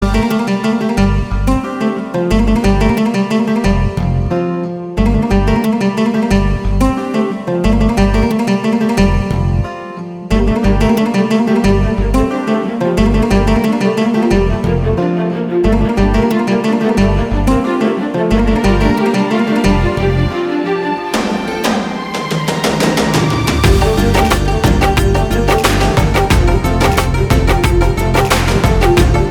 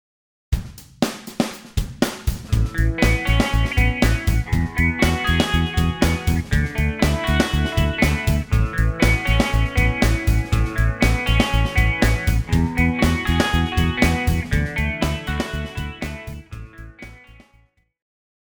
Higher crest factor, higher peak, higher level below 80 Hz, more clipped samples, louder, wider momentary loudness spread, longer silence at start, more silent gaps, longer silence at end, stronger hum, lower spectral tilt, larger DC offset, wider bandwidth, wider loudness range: second, 12 dB vs 20 dB; about the same, 0 dBFS vs 0 dBFS; first, -18 dBFS vs -24 dBFS; neither; first, -14 LUFS vs -20 LUFS; second, 5 LU vs 10 LU; second, 0 s vs 0.5 s; neither; second, 0 s vs 1.4 s; neither; about the same, -6 dB/octave vs -5.5 dB/octave; neither; about the same, 19 kHz vs over 20 kHz; second, 2 LU vs 5 LU